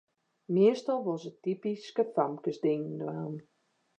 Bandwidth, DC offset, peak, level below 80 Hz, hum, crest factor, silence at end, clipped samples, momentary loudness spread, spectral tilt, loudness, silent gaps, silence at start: 8.6 kHz; under 0.1%; -14 dBFS; -88 dBFS; none; 18 dB; 0.6 s; under 0.1%; 11 LU; -7.5 dB/octave; -31 LUFS; none; 0.5 s